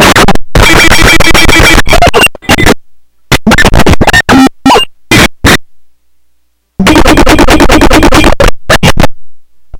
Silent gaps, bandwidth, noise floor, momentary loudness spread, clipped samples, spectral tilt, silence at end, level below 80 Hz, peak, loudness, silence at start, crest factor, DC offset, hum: none; over 20 kHz; -52 dBFS; 6 LU; 20%; -4 dB/octave; 0 s; -12 dBFS; 0 dBFS; -4 LUFS; 0 s; 4 dB; under 0.1%; none